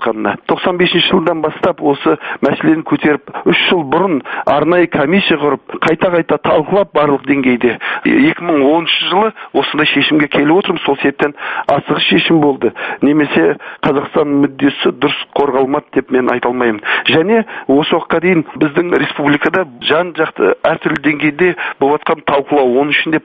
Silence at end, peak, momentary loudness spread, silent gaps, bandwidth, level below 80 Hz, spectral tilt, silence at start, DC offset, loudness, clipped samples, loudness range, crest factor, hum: 0.05 s; 0 dBFS; 5 LU; none; 5 kHz; -50 dBFS; -7.5 dB/octave; 0 s; under 0.1%; -13 LUFS; under 0.1%; 2 LU; 12 dB; none